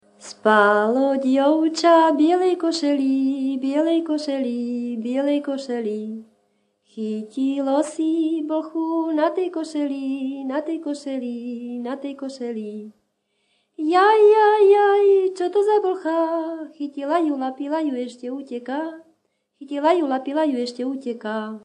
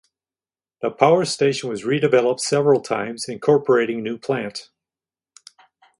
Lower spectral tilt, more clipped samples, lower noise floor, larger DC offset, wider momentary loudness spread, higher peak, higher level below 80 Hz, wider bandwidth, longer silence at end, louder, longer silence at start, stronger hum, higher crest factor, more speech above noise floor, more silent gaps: about the same, -4.5 dB/octave vs -5 dB/octave; neither; second, -71 dBFS vs under -90 dBFS; neither; first, 15 LU vs 11 LU; second, -4 dBFS vs 0 dBFS; second, -80 dBFS vs -66 dBFS; second, 10 kHz vs 11.5 kHz; second, 0.05 s vs 1.35 s; about the same, -21 LUFS vs -20 LUFS; second, 0.2 s vs 0.8 s; neither; about the same, 18 dB vs 20 dB; second, 50 dB vs over 71 dB; neither